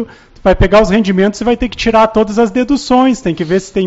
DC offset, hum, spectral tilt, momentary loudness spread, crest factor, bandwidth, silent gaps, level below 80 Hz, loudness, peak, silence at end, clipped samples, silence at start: under 0.1%; none; -5 dB/octave; 6 LU; 12 dB; 8 kHz; none; -26 dBFS; -12 LUFS; 0 dBFS; 0 s; under 0.1%; 0 s